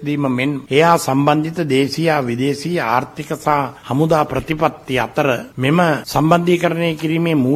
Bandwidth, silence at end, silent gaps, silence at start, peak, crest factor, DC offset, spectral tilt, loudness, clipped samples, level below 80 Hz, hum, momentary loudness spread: 15 kHz; 0 s; none; 0 s; 0 dBFS; 16 dB; under 0.1%; -6 dB/octave; -17 LUFS; under 0.1%; -48 dBFS; none; 6 LU